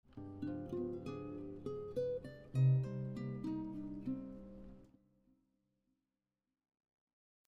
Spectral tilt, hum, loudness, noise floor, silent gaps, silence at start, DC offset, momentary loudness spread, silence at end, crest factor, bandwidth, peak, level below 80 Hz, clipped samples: -10 dB/octave; none; -41 LUFS; under -90 dBFS; none; 0.1 s; under 0.1%; 18 LU; 2.6 s; 18 dB; 5.6 kHz; -24 dBFS; -66 dBFS; under 0.1%